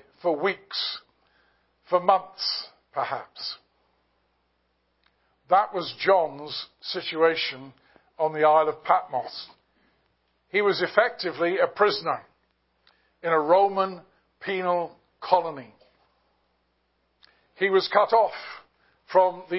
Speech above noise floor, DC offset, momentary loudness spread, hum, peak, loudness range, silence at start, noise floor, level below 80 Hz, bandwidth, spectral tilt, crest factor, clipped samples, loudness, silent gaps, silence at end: 48 dB; under 0.1%; 16 LU; none; -4 dBFS; 6 LU; 0.25 s; -72 dBFS; -74 dBFS; 5.8 kHz; -7.5 dB/octave; 24 dB; under 0.1%; -25 LUFS; none; 0 s